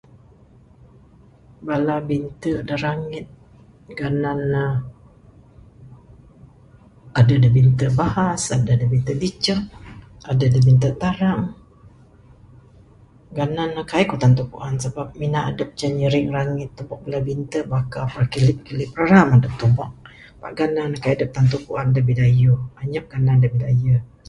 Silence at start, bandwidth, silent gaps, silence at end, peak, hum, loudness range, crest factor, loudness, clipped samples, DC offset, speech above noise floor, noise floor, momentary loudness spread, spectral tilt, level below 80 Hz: 1.6 s; 11 kHz; none; 0.2 s; 0 dBFS; none; 8 LU; 20 dB; -20 LUFS; under 0.1%; under 0.1%; 31 dB; -49 dBFS; 13 LU; -7 dB/octave; -44 dBFS